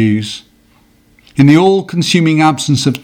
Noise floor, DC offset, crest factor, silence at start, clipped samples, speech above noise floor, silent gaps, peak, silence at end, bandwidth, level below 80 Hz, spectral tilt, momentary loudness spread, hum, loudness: -50 dBFS; under 0.1%; 12 dB; 0 s; 0.2%; 39 dB; none; 0 dBFS; 0.05 s; 17 kHz; -50 dBFS; -5.5 dB/octave; 15 LU; none; -11 LUFS